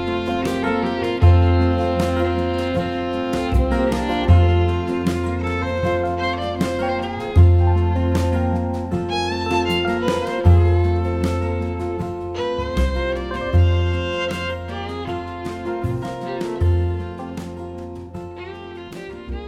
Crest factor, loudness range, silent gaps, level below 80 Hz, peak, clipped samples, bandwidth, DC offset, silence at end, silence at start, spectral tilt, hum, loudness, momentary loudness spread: 18 dB; 6 LU; none; -28 dBFS; -2 dBFS; under 0.1%; 10 kHz; under 0.1%; 0 s; 0 s; -7.5 dB/octave; none; -20 LUFS; 15 LU